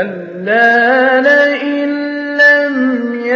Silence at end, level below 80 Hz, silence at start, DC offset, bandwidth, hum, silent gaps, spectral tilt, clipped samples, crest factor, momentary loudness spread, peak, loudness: 0 s; -68 dBFS; 0 s; under 0.1%; 7.6 kHz; none; none; -5.5 dB/octave; under 0.1%; 12 dB; 10 LU; 0 dBFS; -11 LUFS